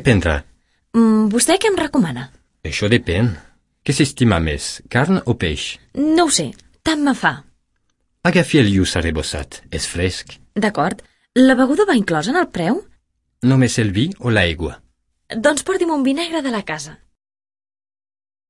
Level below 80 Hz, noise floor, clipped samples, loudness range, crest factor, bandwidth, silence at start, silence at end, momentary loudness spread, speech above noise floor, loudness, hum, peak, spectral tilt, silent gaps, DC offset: -40 dBFS; -66 dBFS; under 0.1%; 3 LU; 16 dB; 11.5 kHz; 0 s; 1.55 s; 13 LU; 50 dB; -17 LUFS; none; -2 dBFS; -5 dB/octave; none; under 0.1%